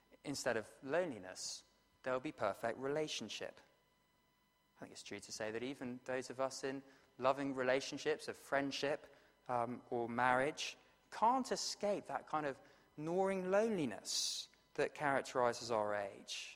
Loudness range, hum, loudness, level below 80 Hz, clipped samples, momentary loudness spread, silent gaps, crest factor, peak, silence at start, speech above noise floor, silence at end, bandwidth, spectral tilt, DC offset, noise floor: 7 LU; none; -40 LUFS; -78 dBFS; under 0.1%; 13 LU; none; 22 dB; -18 dBFS; 0.25 s; 37 dB; 0 s; 16 kHz; -3.5 dB/octave; under 0.1%; -77 dBFS